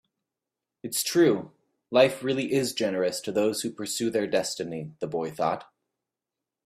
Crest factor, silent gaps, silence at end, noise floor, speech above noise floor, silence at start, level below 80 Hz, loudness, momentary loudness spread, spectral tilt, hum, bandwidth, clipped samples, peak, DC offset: 22 dB; none; 1.05 s; -88 dBFS; 62 dB; 0.85 s; -70 dBFS; -27 LUFS; 11 LU; -4 dB/octave; none; 16 kHz; under 0.1%; -4 dBFS; under 0.1%